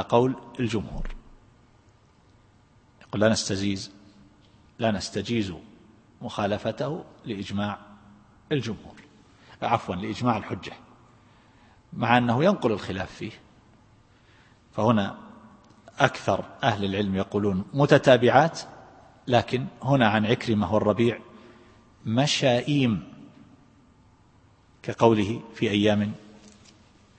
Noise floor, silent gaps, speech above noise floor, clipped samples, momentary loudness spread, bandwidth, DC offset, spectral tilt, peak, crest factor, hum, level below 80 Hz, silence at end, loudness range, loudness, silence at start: -58 dBFS; none; 34 dB; under 0.1%; 17 LU; 8.8 kHz; under 0.1%; -5.5 dB/octave; -2 dBFS; 26 dB; none; -50 dBFS; 0.7 s; 9 LU; -25 LUFS; 0 s